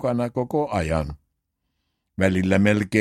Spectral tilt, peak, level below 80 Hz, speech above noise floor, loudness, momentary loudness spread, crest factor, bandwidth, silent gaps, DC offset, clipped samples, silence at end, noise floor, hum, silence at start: -7 dB/octave; -4 dBFS; -42 dBFS; 55 dB; -22 LUFS; 9 LU; 20 dB; 13 kHz; none; under 0.1%; under 0.1%; 0 s; -76 dBFS; none; 0 s